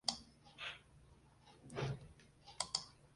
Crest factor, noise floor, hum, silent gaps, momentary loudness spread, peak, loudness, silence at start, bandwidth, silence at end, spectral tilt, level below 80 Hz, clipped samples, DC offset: 32 dB; -66 dBFS; none; none; 24 LU; -16 dBFS; -45 LUFS; 0.05 s; 11.5 kHz; 0 s; -2.5 dB/octave; -68 dBFS; under 0.1%; under 0.1%